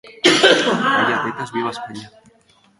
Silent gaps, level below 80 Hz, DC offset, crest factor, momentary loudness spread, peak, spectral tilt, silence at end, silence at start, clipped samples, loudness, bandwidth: none; -62 dBFS; under 0.1%; 18 dB; 19 LU; 0 dBFS; -3 dB/octave; 0.7 s; 0.05 s; under 0.1%; -16 LUFS; 11.5 kHz